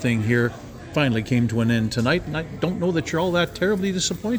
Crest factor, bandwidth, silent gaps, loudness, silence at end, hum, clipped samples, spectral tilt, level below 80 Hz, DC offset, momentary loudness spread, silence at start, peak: 16 dB; over 20 kHz; none; -22 LUFS; 0 s; none; under 0.1%; -5.5 dB/octave; -46 dBFS; under 0.1%; 6 LU; 0 s; -6 dBFS